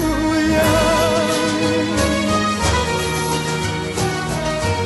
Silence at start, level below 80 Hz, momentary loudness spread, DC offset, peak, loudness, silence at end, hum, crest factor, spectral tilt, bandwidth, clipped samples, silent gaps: 0 s; -32 dBFS; 6 LU; under 0.1%; -6 dBFS; -18 LUFS; 0 s; none; 12 dB; -4.5 dB/octave; 12.5 kHz; under 0.1%; none